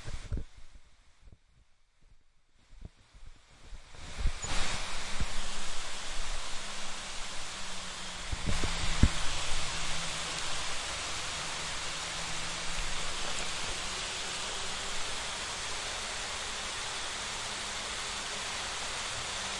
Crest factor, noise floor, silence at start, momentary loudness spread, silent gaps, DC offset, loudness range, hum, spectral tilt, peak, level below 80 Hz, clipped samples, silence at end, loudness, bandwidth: 26 dB; -63 dBFS; 0 s; 5 LU; none; under 0.1%; 6 LU; none; -2 dB/octave; -6 dBFS; -40 dBFS; under 0.1%; 0 s; -35 LUFS; 11.5 kHz